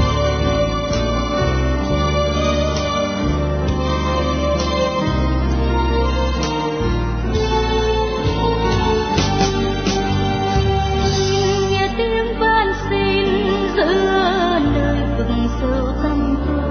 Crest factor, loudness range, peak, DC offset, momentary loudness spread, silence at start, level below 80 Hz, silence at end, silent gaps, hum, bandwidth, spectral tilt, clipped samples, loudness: 14 dB; 2 LU; -2 dBFS; under 0.1%; 3 LU; 0 s; -24 dBFS; 0 s; none; none; 6.6 kHz; -5.5 dB/octave; under 0.1%; -18 LUFS